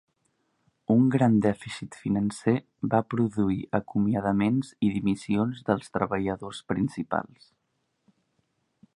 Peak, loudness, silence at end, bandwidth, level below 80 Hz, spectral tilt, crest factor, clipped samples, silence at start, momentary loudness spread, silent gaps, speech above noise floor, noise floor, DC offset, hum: -6 dBFS; -27 LUFS; 1.7 s; 11 kHz; -56 dBFS; -7.5 dB/octave; 20 dB; under 0.1%; 0.9 s; 10 LU; none; 50 dB; -76 dBFS; under 0.1%; none